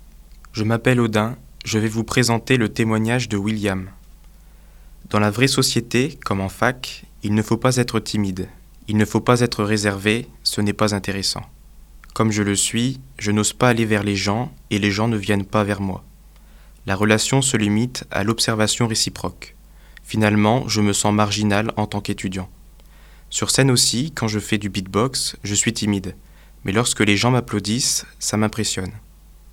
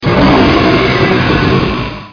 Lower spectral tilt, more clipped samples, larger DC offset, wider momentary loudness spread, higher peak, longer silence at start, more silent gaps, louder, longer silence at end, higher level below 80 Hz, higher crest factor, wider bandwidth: second, -4 dB/octave vs -7 dB/octave; neither; neither; first, 10 LU vs 6 LU; about the same, 0 dBFS vs 0 dBFS; about the same, 0.05 s vs 0 s; neither; second, -20 LUFS vs -10 LUFS; about the same, 0.05 s vs 0 s; second, -44 dBFS vs -24 dBFS; first, 20 dB vs 10 dB; first, 17 kHz vs 5.4 kHz